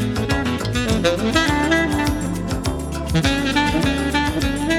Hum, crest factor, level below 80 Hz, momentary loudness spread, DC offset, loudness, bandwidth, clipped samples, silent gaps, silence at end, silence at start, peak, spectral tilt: none; 16 dB; -30 dBFS; 6 LU; under 0.1%; -19 LUFS; 18 kHz; under 0.1%; none; 0 s; 0 s; -2 dBFS; -5 dB/octave